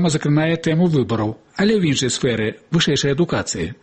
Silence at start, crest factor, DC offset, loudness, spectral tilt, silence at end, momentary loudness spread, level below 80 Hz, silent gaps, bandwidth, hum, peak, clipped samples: 0 s; 12 dB; under 0.1%; -19 LUFS; -5 dB/octave; 0.1 s; 6 LU; -48 dBFS; none; 8.8 kHz; none; -6 dBFS; under 0.1%